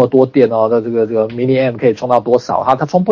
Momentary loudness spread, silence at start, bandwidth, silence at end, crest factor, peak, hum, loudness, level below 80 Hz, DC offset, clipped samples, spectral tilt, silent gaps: 4 LU; 0 s; 7.2 kHz; 0 s; 12 dB; 0 dBFS; none; -13 LUFS; -54 dBFS; under 0.1%; 0.3%; -8 dB/octave; none